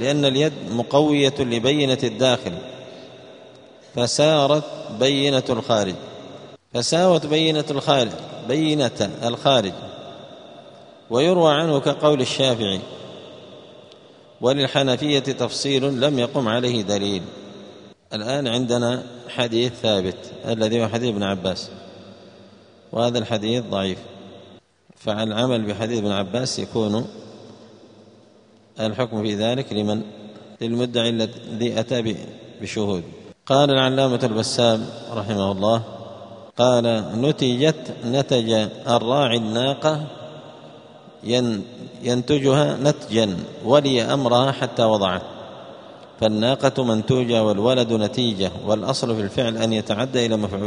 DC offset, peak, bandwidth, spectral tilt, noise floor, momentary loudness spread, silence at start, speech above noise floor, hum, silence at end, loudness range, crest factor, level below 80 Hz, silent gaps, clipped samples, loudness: under 0.1%; 0 dBFS; 10.5 kHz; -5 dB/octave; -52 dBFS; 19 LU; 0 s; 32 dB; none; 0 s; 5 LU; 20 dB; -58 dBFS; none; under 0.1%; -21 LUFS